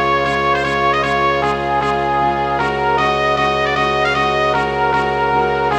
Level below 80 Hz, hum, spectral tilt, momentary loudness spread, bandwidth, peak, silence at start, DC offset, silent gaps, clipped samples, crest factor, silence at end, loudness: -36 dBFS; none; -5 dB/octave; 2 LU; 11 kHz; -2 dBFS; 0 s; 0.1%; none; under 0.1%; 14 dB; 0 s; -16 LUFS